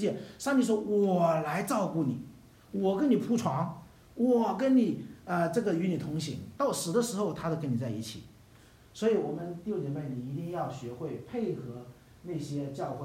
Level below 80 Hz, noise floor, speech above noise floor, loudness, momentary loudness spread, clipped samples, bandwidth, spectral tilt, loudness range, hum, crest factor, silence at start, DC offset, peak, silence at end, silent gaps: -64 dBFS; -57 dBFS; 27 dB; -31 LUFS; 13 LU; under 0.1%; 16 kHz; -6.5 dB/octave; 6 LU; none; 16 dB; 0 s; under 0.1%; -14 dBFS; 0 s; none